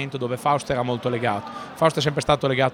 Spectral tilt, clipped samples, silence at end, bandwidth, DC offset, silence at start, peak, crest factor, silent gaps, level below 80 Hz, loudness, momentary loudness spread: -5.5 dB/octave; under 0.1%; 0 s; 16.5 kHz; under 0.1%; 0 s; -4 dBFS; 18 dB; none; -50 dBFS; -23 LUFS; 7 LU